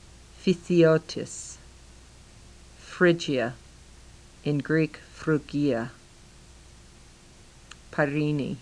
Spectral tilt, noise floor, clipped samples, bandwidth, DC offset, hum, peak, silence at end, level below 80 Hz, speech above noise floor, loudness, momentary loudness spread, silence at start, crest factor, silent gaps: -6 dB/octave; -52 dBFS; under 0.1%; 10.5 kHz; under 0.1%; none; -8 dBFS; 0 s; -54 dBFS; 27 dB; -26 LUFS; 22 LU; 0.4 s; 22 dB; none